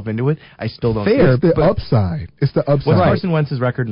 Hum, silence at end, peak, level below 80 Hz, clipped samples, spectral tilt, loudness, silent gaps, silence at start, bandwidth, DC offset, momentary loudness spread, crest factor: none; 0 s; -4 dBFS; -36 dBFS; under 0.1%; -13 dB/octave; -16 LUFS; none; 0 s; 5.4 kHz; under 0.1%; 8 LU; 12 dB